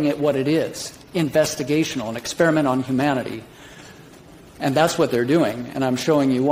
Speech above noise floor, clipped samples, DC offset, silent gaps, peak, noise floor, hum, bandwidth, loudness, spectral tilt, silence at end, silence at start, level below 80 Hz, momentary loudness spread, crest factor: 25 dB; under 0.1%; under 0.1%; none; -2 dBFS; -45 dBFS; none; 16 kHz; -21 LUFS; -5.5 dB/octave; 0 s; 0 s; -56 dBFS; 9 LU; 20 dB